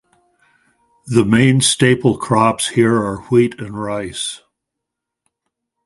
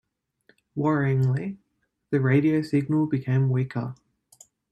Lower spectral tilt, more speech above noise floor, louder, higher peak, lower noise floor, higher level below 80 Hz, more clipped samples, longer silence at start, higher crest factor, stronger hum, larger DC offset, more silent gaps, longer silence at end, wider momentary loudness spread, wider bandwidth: second, -5 dB/octave vs -9 dB/octave; first, 66 dB vs 41 dB; first, -15 LUFS vs -24 LUFS; first, 0 dBFS vs -8 dBFS; first, -81 dBFS vs -64 dBFS; first, -50 dBFS vs -64 dBFS; neither; first, 1.05 s vs 0.75 s; about the same, 18 dB vs 16 dB; neither; neither; neither; first, 1.5 s vs 0.8 s; second, 11 LU vs 14 LU; first, 11.5 kHz vs 8.8 kHz